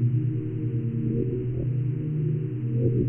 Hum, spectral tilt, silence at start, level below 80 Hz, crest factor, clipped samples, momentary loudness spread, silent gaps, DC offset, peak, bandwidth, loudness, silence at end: none; -13.5 dB/octave; 0 s; -46 dBFS; 14 dB; under 0.1%; 3 LU; none; under 0.1%; -12 dBFS; 3 kHz; -27 LUFS; 0 s